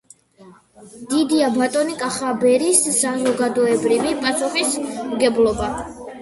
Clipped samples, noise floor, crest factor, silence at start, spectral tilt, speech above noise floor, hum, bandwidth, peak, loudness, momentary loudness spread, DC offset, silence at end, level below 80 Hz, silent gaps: under 0.1%; -47 dBFS; 18 dB; 0.4 s; -3 dB/octave; 29 dB; none; 12 kHz; -2 dBFS; -18 LUFS; 9 LU; under 0.1%; 0 s; -48 dBFS; none